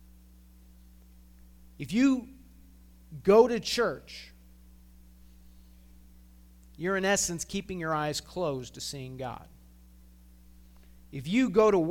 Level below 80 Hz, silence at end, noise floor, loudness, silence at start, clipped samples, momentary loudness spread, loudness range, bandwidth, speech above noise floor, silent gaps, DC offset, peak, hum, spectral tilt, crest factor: -54 dBFS; 0 s; -55 dBFS; -28 LUFS; 1.8 s; under 0.1%; 21 LU; 9 LU; 17.5 kHz; 27 dB; none; under 0.1%; -8 dBFS; none; -4.5 dB/octave; 22 dB